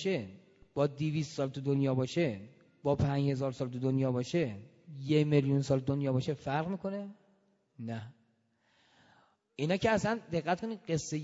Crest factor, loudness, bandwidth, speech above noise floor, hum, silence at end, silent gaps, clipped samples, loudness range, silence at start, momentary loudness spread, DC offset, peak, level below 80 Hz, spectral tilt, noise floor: 20 dB; -33 LUFS; 8 kHz; 41 dB; none; 0 s; none; under 0.1%; 7 LU; 0 s; 15 LU; under 0.1%; -14 dBFS; -62 dBFS; -7 dB/octave; -73 dBFS